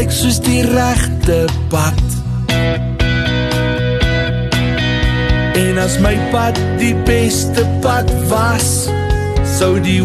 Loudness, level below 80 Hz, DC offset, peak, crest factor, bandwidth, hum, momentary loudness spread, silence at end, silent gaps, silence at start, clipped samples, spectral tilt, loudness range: -14 LUFS; -22 dBFS; under 0.1%; -2 dBFS; 12 dB; 13.5 kHz; none; 3 LU; 0 s; none; 0 s; under 0.1%; -5 dB/octave; 1 LU